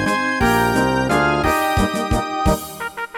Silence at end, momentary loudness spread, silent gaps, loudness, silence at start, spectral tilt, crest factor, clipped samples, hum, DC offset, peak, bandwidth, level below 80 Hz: 0 s; 5 LU; none; -18 LUFS; 0 s; -5 dB/octave; 14 dB; under 0.1%; none; under 0.1%; -4 dBFS; 19 kHz; -30 dBFS